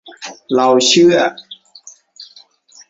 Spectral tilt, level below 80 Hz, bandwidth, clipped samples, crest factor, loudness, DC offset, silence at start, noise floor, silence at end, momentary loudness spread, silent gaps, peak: -3 dB/octave; -60 dBFS; 8 kHz; under 0.1%; 16 dB; -12 LUFS; under 0.1%; 0.05 s; -46 dBFS; 0.65 s; 24 LU; none; 0 dBFS